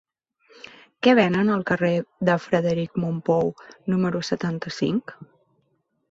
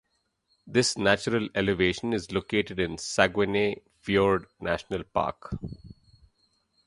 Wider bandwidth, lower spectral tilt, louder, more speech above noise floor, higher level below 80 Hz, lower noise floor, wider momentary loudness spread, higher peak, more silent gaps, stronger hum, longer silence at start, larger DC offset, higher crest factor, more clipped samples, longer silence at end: second, 7.8 kHz vs 11.5 kHz; first, -7 dB/octave vs -4.5 dB/octave; first, -23 LUFS vs -27 LUFS; about the same, 48 dB vs 47 dB; second, -60 dBFS vs -50 dBFS; about the same, -71 dBFS vs -73 dBFS; second, 10 LU vs 13 LU; about the same, -4 dBFS vs -4 dBFS; neither; neither; first, 1 s vs 0.65 s; neither; about the same, 20 dB vs 24 dB; neither; about the same, 0.85 s vs 0.95 s